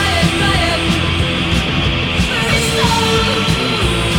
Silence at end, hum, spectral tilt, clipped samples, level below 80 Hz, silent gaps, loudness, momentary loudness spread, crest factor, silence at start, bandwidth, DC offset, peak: 0 s; none; -4 dB/octave; under 0.1%; -26 dBFS; none; -14 LUFS; 2 LU; 14 dB; 0 s; 19 kHz; under 0.1%; -2 dBFS